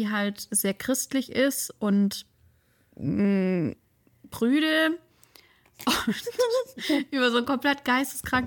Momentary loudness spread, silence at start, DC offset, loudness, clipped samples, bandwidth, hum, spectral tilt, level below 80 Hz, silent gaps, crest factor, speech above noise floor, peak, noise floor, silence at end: 6 LU; 0 s; under 0.1%; -26 LUFS; under 0.1%; 18 kHz; none; -4 dB/octave; -60 dBFS; none; 14 dB; 38 dB; -12 dBFS; -63 dBFS; 0 s